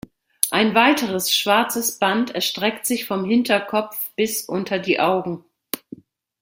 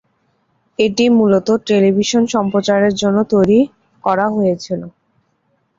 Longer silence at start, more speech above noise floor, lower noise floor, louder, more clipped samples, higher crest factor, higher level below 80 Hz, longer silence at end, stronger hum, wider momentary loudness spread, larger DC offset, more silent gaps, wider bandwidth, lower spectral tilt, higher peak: second, 0.45 s vs 0.8 s; second, 22 dB vs 50 dB; second, -43 dBFS vs -63 dBFS; second, -20 LUFS vs -15 LUFS; neither; first, 22 dB vs 12 dB; second, -64 dBFS vs -52 dBFS; second, 0.65 s vs 0.9 s; neither; about the same, 12 LU vs 10 LU; neither; neither; first, 16.5 kHz vs 7.8 kHz; second, -3 dB/octave vs -5.5 dB/octave; about the same, 0 dBFS vs -2 dBFS